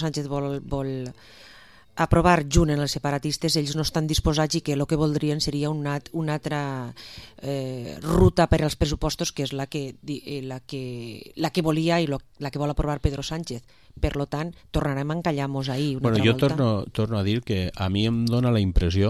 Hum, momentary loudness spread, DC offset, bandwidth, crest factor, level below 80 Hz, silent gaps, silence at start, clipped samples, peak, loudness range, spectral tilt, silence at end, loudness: none; 13 LU; 0.2%; 14.5 kHz; 20 dB; -36 dBFS; none; 0 s; under 0.1%; -4 dBFS; 5 LU; -5.5 dB/octave; 0 s; -25 LUFS